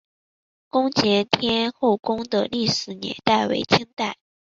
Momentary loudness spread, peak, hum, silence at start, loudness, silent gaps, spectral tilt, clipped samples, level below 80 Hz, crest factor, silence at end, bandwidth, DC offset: 9 LU; -2 dBFS; none; 0.75 s; -22 LUFS; 3.93-3.97 s; -4.5 dB/octave; under 0.1%; -58 dBFS; 22 dB; 0.4 s; 7.8 kHz; under 0.1%